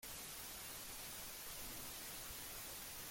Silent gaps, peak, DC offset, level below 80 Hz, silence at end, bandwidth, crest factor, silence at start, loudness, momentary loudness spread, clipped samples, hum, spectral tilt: none; -38 dBFS; under 0.1%; -64 dBFS; 0 s; 17 kHz; 12 dB; 0 s; -48 LUFS; 1 LU; under 0.1%; none; -1 dB/octave